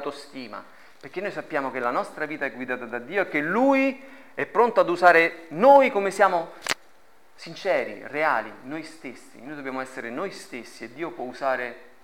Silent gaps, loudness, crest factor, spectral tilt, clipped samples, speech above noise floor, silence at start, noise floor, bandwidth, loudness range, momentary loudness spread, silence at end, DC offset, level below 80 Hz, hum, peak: none; -23 LUFS; 22 dB; -4.5 dB/octave; under 0.1%; 34 dB; 0 s; -58 dBFS; 16.5 kHz; 11 LU; 22 LU; 0.25 s; 0.3%; -72 dBFS; none; -4 dBFS